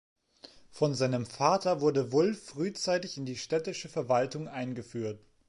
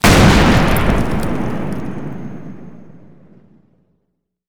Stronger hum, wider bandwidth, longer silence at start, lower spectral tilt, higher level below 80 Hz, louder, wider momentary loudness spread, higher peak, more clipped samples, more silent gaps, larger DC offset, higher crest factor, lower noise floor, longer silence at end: neither; second, 11.5 kHz vs over 20 kHz; first, 0.7 s vs 0 s; about the same, -5.5 dB/octave vs -5.5 dB/octave; second, -70 dBFS vs -24 dBFS; second, -31 LUFS vs -15 LUFS; second, 10 LU vs 23 LU; second, -10 dBFS vs 0 dBFS; neither; neither; neither; first, 22 dB vs 16 dB; second, -56 dBFS vs -70 dBFS; first, 0.3 s vs 0 s